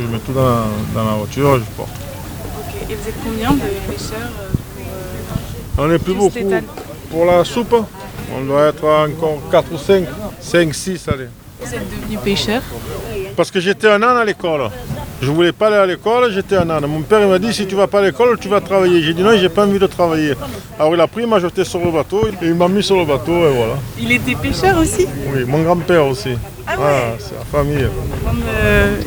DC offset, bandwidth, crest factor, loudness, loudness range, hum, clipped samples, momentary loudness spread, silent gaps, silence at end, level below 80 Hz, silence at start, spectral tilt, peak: 0.2%; over 20 kHz; 16 dB; -16 LUFS; 6 LU; none; under 0.1%; 13 LU; none; 0 s; -32 dBFS; 0 s; -5.5 dB/octave; 0 dBFS